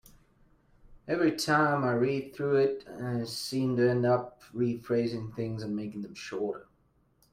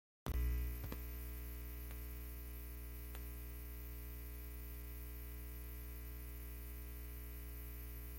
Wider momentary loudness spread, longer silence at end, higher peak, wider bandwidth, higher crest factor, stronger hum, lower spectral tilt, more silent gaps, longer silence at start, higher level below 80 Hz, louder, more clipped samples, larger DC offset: first, 12 LU vs 7 LU; first, 0.7 s vs 0 s; first, -12 dBFS vs -28 dBFS; about the same, 16 kHz vs 17 kHz; about the same, 18 dB vs 18 dB; second, none vs 60 Hz at -50 dBFS; about the same, -6 dB/octave vs -5.5 dB/octave; neither; first, 0.9 s vs 0.25 s; second, -64 dBFS vs -48 dBFS; first, -30 LUFS vs -49 LUFS; neither; neither